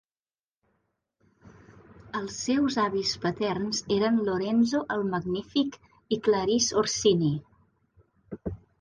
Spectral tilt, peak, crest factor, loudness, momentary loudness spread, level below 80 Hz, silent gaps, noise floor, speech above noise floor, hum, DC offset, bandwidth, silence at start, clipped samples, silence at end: -4.5 dB/octave; -12 dBFS; 18 dB; -27 LUFS; 12 LU; -58 dBFS; none; under -90 dBFS; over 64 dB; none; under 0.1%; 10 kHz; 1.45 s; under 0.1%; 0.25 s